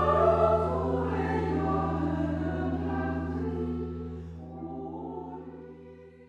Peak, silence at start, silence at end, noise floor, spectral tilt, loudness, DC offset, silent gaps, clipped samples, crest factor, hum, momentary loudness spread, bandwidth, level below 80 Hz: -12 dBFS; 0 s; 0.05 s; -49 dBFS; -9 dB/octave; -30 LUFS; under 0.1%; none; under 0.1%; 18 dB; none; 18 LU; 8 kHz; -42 dBFS